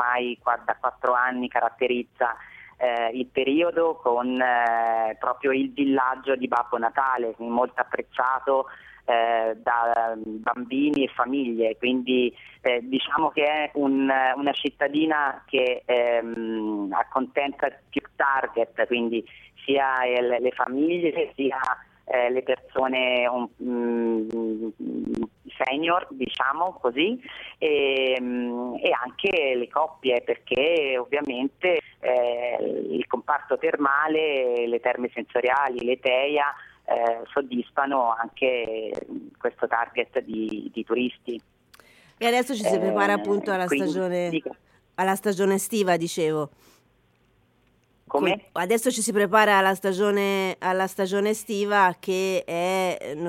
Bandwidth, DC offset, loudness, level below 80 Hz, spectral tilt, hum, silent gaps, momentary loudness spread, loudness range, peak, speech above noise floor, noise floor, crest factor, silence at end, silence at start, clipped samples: 16.5 kHz; under 0.1%; -24 LUFS; -66 dBFS; -4 dB/octave; none; none; 7 LU; 4 LU; -4 dBFS; 39 dB; -64 dBFS; 20 dB; 0 s; 0 s; under 0.1%